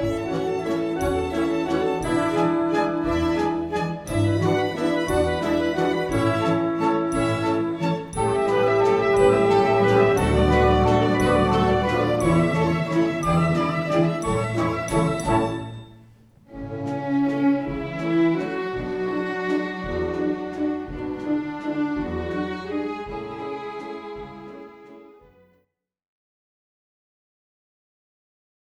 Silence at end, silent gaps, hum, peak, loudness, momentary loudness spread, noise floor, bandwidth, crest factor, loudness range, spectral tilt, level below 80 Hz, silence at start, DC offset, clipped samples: 3.65 s; none; none; -6 dBFS; -22 LUFS; 12 LU; -69 dBFS; 13.5 kHz; 18 dB; 11 LU; -6.5 dB/octave; -40 dBFS; 0 s; under 0.1%; under 0.1%